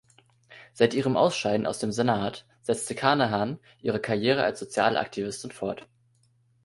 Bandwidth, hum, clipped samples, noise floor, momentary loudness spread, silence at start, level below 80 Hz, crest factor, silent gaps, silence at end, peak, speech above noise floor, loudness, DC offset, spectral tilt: 11.5 kHz; none; under 0.1%; -65 dBFS; 10 LU; 0.5 s; -62 dBFS; 20 dB; none; 0.85 s; -6 dBFS; 39 dB; -27 LUFS; under 0.1%; -5 dB/octave